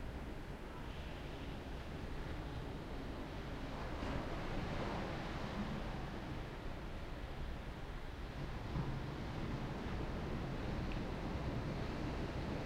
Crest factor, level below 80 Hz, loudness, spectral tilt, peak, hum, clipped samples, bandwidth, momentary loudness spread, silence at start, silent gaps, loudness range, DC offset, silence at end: 14 dB; -48 dBFS; -45 LUFS; -6.5 dB/octave; -28 dBFS; none; under 0.1%; 16 kHz; 6 LU; 0 s; none; 4 LU; under 0.1%; 0 s